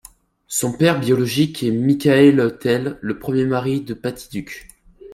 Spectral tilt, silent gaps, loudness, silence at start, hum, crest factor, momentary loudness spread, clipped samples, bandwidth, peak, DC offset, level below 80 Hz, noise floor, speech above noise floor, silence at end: -5.5 dB/octave; none; -18 LUFS; 0.5 s; none; 18 dB; 16 LU; under 0.1%; 16 kHz; 0 dBFS; under 0.1%; -52 dBFS; -46 dBFS; 29 dB; 0 s